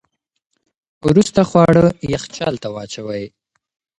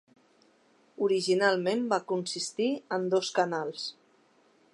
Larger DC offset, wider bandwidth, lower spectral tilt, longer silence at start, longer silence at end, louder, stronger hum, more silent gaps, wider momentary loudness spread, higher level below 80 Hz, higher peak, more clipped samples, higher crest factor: neither; about the same, 11 kHz vs 11.5 kHz; first, -6.5 dB/octave vs -4 dB/octave; about the same, 1.05 s vs 1 s; about the same, 0.7 s vs 0.8 s; first, -16 LUFS vs -29 LUFS; neither; neither; first, 15 LU vs 8 LU; first, -44 dBFS vs -86 dBFS; first, 0 dBFS vs -10 dBFS; neither; about the same, 18 dB vs 20 dB